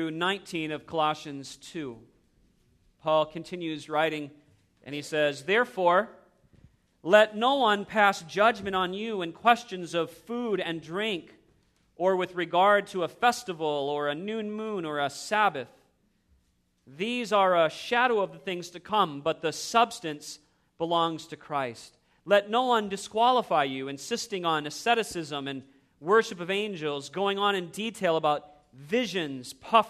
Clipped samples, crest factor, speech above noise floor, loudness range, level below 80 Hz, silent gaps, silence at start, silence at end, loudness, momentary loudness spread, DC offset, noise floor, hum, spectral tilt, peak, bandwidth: under 0.1%; 22 dB; 42 dB; 6 LU; -70 dBFS; none; 0 s; 0 s; -27 LUFS; 13 LU; under 0.1%; -70 dBFS; none; -4 dB/octave; -6 dBFS; 14 kHz